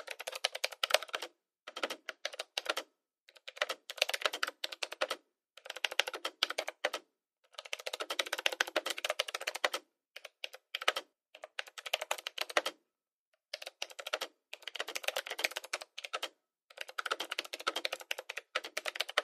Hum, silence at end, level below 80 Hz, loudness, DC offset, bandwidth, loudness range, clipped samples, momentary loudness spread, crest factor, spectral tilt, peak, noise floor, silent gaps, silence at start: none; 0 s; under -90 dBFS; -37 LUFS; under 0.1%; 15.5 kHz; 4 LU; under 0.1%; 13 LU; 34 dB; 2 dB/octave; -6 dBFS; under -90 dBFS; 3.21-3.26 s, 13.13-13.32 s; 0 s